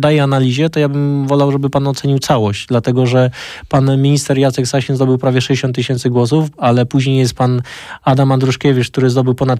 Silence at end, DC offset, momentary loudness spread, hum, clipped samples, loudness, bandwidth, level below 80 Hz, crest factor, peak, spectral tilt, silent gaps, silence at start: 0 s; under 0.1%; 4 LU; none; under 0.1%; -14 LUFS; 13 kHz; -46 dBFS; 10 dB; -2 dBFS; -6.5 dB/octave; none; 0 s